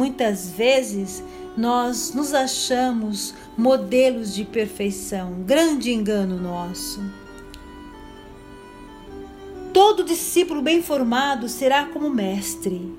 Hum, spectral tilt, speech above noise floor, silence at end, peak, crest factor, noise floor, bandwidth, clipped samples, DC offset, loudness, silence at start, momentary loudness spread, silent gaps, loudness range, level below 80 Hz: none; -4 dB/octave; 20 dB; 0 s; -4 dBFS; 18 dB; -41 dBFS; 16 kHz; under 0.1%; under 0.1%; -21 LUFS; 0 s; 22 LU; none; 8 LU; -50 dBFS